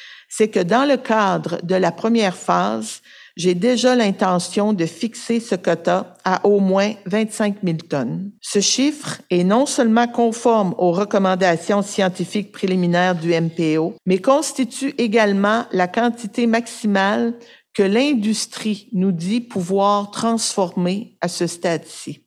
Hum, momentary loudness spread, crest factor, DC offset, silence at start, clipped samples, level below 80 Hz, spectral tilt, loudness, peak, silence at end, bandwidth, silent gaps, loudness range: none; 7 LU; 16 dB; under 0.1%; 0 s; under 0.1%; -70 dBFS; -5 dB/octave; -19 LUFS; -2 dBFS; 0.1 s; 14 kHz; none; 2 LU